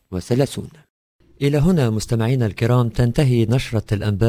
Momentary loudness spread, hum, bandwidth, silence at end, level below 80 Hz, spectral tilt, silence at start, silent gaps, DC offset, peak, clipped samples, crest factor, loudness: 6 LU; none; 16 kHz; 0 s; -38 dBFS; -7 dB/octave; 0.1 s; 0.90-1.19 s; under 0.1%; -2 dBFS; under 0.1%; 16 dB; -19 LUFS